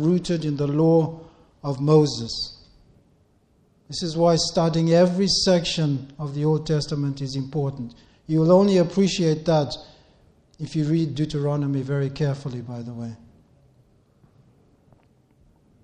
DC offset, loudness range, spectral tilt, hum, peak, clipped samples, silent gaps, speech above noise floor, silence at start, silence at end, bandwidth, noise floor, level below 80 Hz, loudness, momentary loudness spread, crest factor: under 0.1%; 8 LU; -6 dB/octave; none; -4 dBFS; under 0.1%; none; 39 dB; 0 s; 2.7 s; 9.6 kHz; -61 dBFS; -52 dBFS; -22 LUFS; 15 LU; 18 dB